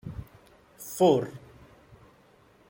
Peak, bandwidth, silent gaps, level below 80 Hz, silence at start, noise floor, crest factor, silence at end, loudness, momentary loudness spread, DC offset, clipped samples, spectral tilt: -10 dBFS; 16.5 kHz; none; -56 dBFS; 0.05 s; -59 dBFS; 22 dB; 1.35 s; -26 LUFS; 22 LU; under 0.1%; under 0.1%; -6 dB/octave